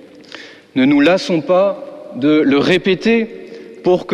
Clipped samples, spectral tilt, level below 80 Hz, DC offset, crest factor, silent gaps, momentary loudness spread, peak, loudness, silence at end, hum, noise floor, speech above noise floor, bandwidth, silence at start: under 0.1%; -6 dB/octave; -52 dBFS; under 0.1%; 12 dB; none; 22 LU; -2 dBFS; -14 LUFS; 0 s; none; -37 dBFS; 23 dB; 9.4 kHz; 0.35 s